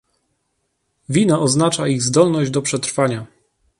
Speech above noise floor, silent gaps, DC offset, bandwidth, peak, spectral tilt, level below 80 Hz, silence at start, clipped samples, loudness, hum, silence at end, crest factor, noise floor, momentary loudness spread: 54 dB; none; under 0.1%; 11.5 kHz; -2 dBFS; -5 dB/octave; -56 dBFS; 1.1 s; under 0.1%; -17 LUFS; none; 0.55 s; 18 dB; -70 dBFS; 6 LU